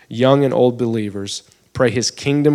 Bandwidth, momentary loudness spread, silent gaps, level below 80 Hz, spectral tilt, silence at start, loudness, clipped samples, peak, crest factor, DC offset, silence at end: 13.5 kHz; 13 LU; none; -54 dBFS; -5.5 dB/octave; 0.1 s; -17 LUFS; under 0.1%; 0 dBFS; 16 dB; under 0.1%; 0 s